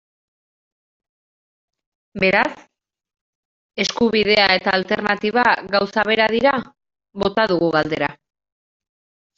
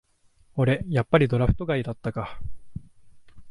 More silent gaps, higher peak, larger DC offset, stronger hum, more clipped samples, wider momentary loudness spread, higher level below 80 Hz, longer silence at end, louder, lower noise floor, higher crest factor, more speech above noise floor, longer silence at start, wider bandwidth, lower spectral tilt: first, 3.21-3.69 s vs none; first, -2 dBFS vs -6 dBFS; neither; neither; neither; second, 9 LU vs 22 LU; second, -54 dBFS vs -40 dBFS; first, 1.25 s vs 0 s; first, -18 LUFS vs -25 LUFS; first, under -90 dBFS vs -59 dBFS; about the same, 20 dB vs 20 dB; first, over 72 dB vs 36 dB; first, 2.15 s vs 0.55 s; second, 7.8 kHz vs 10.5 kHz; second, -4.5 dB/octave vs -8.5 dB/octave